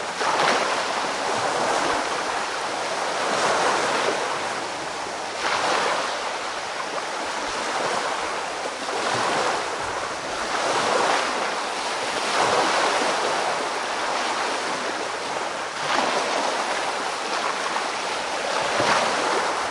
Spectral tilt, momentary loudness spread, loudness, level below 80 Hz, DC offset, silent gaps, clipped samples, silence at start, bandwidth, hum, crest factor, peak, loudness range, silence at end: -1.5 dB/octave; 7 LU; -24 LUFS; -62 dBFS; under 0.1%; none; under 0.1%; 0 s; 11.5 kHz; none; 20 dB; -6 dBFS; 3 LU; 0 s